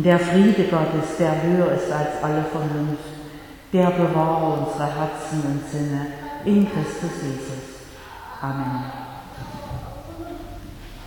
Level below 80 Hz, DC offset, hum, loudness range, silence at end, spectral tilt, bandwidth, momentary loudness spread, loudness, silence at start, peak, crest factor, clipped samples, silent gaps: -46 dBFS; under 0.1%; none; 10 LU; 0 s; -7 dB/octave; 18.5 kHz; 19 LU; -22 LUFS; 0 s; -4 dBFS; 18 dB; under 0.1%; none